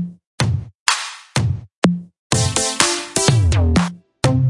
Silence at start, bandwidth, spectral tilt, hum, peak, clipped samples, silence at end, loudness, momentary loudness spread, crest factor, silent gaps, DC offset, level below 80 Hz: 0 s; 11.5 kHz; -4 dB/octave; none; 0 dBFS; under 0.1%; 0 s; -18 LUFS; 8 LU; 18 dB; 0.27-0.38 s, 0.75-0.86 s, 1.75-1.82 s, 2.18-2.30 s; under 0.1%; -34 dBFS